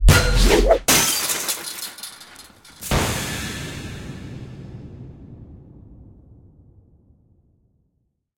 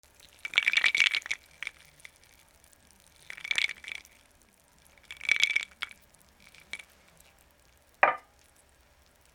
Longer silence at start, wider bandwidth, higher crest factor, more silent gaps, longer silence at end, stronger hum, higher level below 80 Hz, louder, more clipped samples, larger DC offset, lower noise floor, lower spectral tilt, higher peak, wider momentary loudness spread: second, 0 s vs 0.45 s; second, 17 kHz vs over 20 kHz; second, 20 dB vs 32 dB; neither; first, 2.35 s vs 1.15 s; neither; first, -26 dBFS vs -68 dBFS; first, -19 LUFS vs -27 LUFS; neither; neither; first, -71 dBFS vs -63 dBFS; first, -3.5 dB/octave vs 1 dB/octave; about the same, -2 dBFS vs -2 dBFS; first, 25 LU vs 20 LU